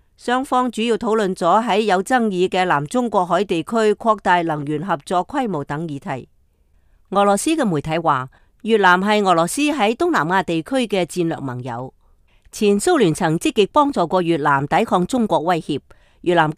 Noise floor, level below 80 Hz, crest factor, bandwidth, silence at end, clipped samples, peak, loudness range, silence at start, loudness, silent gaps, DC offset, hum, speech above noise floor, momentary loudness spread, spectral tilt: -57 dBFS; -52 dBFS; 16 dB; 15.5 kHz; 0.05 s; under 0.1%; -2 dBFS; 4 LU; 0.25 s; -18 LUFS; none; under 0.1%; none; 39 dB; 11 LU; -5 dB/octave